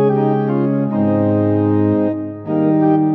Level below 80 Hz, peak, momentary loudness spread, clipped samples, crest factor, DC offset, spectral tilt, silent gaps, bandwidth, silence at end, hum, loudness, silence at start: -62 dBFS; -4 dBFS; 5 LU; under 0.1%; 12 dB; under 0.1%; -12 dB/octave; none; 3.9 kHz; 0 s; none; -16 LUFS; 0 s